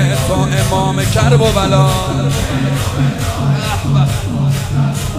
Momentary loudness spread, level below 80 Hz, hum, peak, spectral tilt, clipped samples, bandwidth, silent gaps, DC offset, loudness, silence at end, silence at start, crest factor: 5 LU; -26 dBFS; none; 0 dBFS; -5.5 dB/octave; under 0.1%; 16 kHz; none; under 0.1%; -14 LUFS; 0 s; 0 s; 14 dB